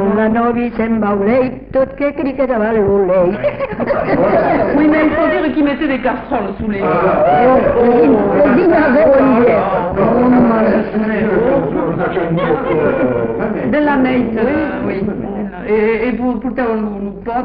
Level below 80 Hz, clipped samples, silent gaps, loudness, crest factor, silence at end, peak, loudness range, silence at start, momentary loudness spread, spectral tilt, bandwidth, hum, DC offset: -36 dBFS; under 0.1%; none; -14 LUFS; 12 dB; 0 s; -2 dBFS; 5 LU; 0 s; 8 LU; -12 dB/octave; 5.2 kHz; none; under 0.1%